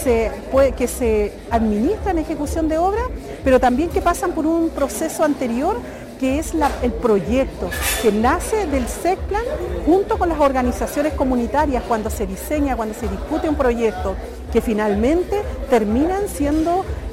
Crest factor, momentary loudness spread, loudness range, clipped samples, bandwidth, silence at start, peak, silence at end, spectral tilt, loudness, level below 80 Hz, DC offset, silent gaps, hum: 16 dB; 6 LU; 2 LU; under 0.1%; 16.5 kHz; 0 s; -4 dBFS; 0 s; -5.5 dB/octave; -19 LUFS; -30 dBFS; under 0.1%; none; none